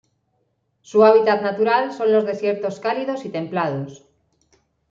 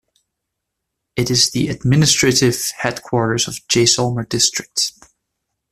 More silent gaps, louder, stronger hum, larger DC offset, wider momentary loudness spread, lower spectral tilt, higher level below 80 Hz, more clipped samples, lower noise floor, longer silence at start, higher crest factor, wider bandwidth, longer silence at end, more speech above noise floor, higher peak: neither; second, -19 LUFS vs -16 LUFS; neither; neither; first, 12 LU vs 8 LU; first, -6.5 dB/octave vs -3.5 dB/octave; second, -68 dBFS vs -48 dBFS; neither; second, -69 dBFS vs -78 dBFS; second, 0.95 s vs 1.15 s; about the same, 18 dB vs 18 dB; second, 7.4 kHz vs 15 kHz; first, 0.95 s vs 0.8 s; second, 50 dB vs 61 dB; about the same, -2 dBFS vs 0 dBFS